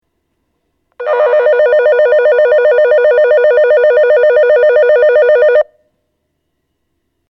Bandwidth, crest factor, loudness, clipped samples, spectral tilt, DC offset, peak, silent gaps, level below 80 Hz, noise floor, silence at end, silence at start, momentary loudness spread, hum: 5.8 kHz; 10 dB; -9 LUFS; under 0.1%; -3 dB/octave; under 0.1%; 0 dBFS; none; -58 dBFS; -67 dBFS; 1.65 s; 1 s; 3 LU; none